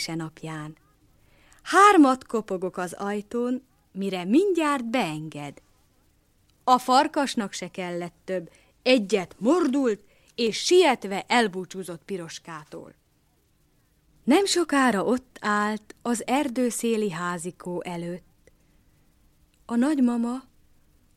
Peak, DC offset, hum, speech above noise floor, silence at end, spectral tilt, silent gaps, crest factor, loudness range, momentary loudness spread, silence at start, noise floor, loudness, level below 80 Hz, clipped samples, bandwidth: -4 dBFS; under 0.1%; none; 41 dB; 0.75 s; -4 dB/octave; none; 22 dB; 7 LU; 17 LU; 0 s; -65 dBFS; -24 LUFS; -64 dBFS; under 0.1%; 15 kHz